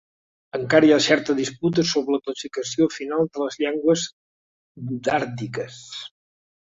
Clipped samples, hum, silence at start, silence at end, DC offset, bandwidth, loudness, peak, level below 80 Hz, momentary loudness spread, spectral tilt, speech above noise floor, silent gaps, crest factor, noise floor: under 0.1%; none; 0.55 s; 0.65 s; under 0.1%; 7.8 kHz; -22 LUFS; -4 dBFS; -64 dBFS; 16 LU; -4.5 dB/octave; over 68 dB; 4.13-4.75 s; 20 dB; under -90 dBFS